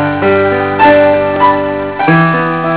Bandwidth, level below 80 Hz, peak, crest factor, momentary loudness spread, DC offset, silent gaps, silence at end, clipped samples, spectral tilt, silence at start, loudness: 4 kHz; -40 dBFS; 0 dBFS; 10 dB; 7 LU; 0.8%; none; 0 s; 0.7%; -10.5 dB/octave; 0 s; -9 LUFS